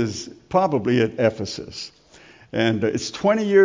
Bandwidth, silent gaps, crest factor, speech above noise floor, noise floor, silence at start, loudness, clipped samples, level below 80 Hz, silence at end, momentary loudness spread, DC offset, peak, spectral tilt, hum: 7.6 kHz; none; 18 dB; 29 dB; -49 dBFS; 0 s; -22 LUFS; under 0.1%; -54 dBFS; 0 s; 14 LU; under 0.1%; -4 dBFS; -5.5 dB/octave; none